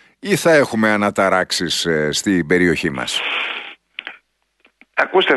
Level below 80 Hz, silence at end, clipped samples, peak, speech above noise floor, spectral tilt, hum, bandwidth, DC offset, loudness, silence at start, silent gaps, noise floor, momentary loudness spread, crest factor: -52 dBFS; 0 s; under 0.1%; -2 dBFS; 43 dB; -4 dB/octave; none; 12.5 kHz; under 0.1%; -17 LUFS; 0.25 s; none; -59 dBFS; 17 LU; 16 dB